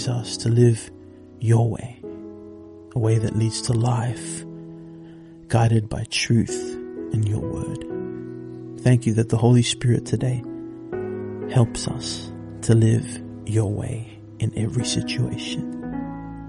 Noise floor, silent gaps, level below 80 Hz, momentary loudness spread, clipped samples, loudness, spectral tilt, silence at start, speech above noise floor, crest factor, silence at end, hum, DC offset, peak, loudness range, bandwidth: -42 dBFS; none; -48 dBFS; 18 LU; under 0.1%; -23 LUFS; -6 dB/octave; 0 s; 22 dB; 20 dB; 0 s; none; under 0.1%; -4 dBFS; 4 LU; 11.5 kHz